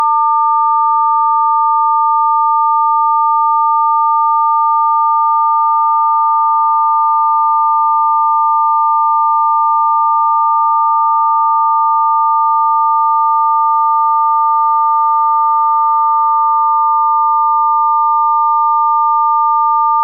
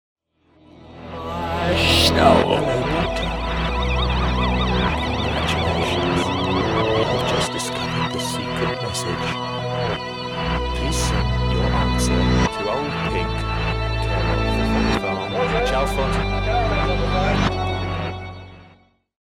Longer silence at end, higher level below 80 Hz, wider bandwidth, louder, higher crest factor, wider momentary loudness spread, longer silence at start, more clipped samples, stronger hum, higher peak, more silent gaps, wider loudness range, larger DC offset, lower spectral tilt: second, 0 s vs 0.6 s; second, -54 dBFS vs -28 dBFS; second, 1.3 kHz vs 16.5 kHz; first, -11 LUFS vs -21 LUFS; second, 6 dB vs 18 dB; second, 0 LU vs 7 LU; second, 0 s vs 0.75 s; neither; neither; second, -6 dBFS vs -2 dBFS; neither; second, 0 LU vs 4 LU; neither; about the same, -5 dB/octave vs -5 dB/octave